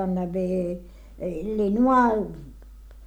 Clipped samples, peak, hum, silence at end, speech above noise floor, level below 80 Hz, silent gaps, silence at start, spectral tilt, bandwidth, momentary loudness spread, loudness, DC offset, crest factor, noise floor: under 0.1%; -10 dBFS; none; 0 s; 21 dB; -44 dBFS; none; 0 s; -8.5 dB/octave; 9 kHz; 16 LU; -24 LUFS; under 0.1%; 16 dB; -44 dBFS